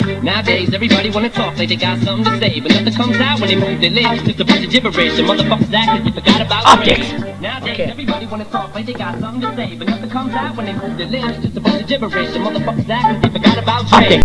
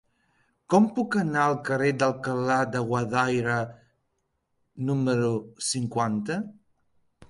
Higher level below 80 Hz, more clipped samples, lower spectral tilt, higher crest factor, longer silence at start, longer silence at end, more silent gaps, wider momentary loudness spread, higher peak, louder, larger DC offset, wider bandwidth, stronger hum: first, -38 dBFS vs -64 dBFS; first, 0.2% vs under 0.1%; about the same, -5.5 dB/octave vs -5.5 dB/octave; about the same, 14 dB vs 18 dB; second, 0 s vs 0.7 s; about the same, 0 s vs 0.05 s; neither; first, 11 LU vs 7 LU; first, 0 dBFS vs -8 dBFS; first, -14 LUFS vs -26 LUFS; first, 0.8% vs under 0.1%; about the same, 11 kHz vs 11.5 kHz; neither